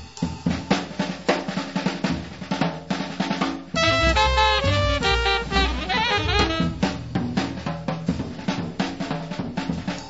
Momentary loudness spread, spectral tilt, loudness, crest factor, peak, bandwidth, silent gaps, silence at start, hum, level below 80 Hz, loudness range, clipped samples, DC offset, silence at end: 10 LU; -5 dB/octave; -23 LUFS; 18 dB; -4 dBFS; 8 kHz; none; 0 s; none; -34 dBFS; 6 LU; under 0.1%; 0.3%; 0 s